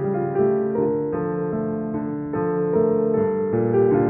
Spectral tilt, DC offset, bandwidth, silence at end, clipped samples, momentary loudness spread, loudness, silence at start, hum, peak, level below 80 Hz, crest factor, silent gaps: -11.5 dB/octave; under 0.1%; 3 kHz; 0 s; under 0.1%; 6 LU; -22 LUFS; 0 s; none; -8 dBFS; -54 dBFS; 14 dB; none